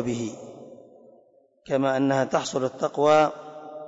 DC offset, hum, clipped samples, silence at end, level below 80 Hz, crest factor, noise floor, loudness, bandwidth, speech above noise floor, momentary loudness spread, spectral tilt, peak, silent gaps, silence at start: under 0.1%; none; under 0.1%; 0 s; -68 dBFS; 16 dB; -59 dBFS; -24 LUFS; 8 kHz; 36 dB; 21 LU; -5.5 dB/octave; -10 dBFS; none; 0 s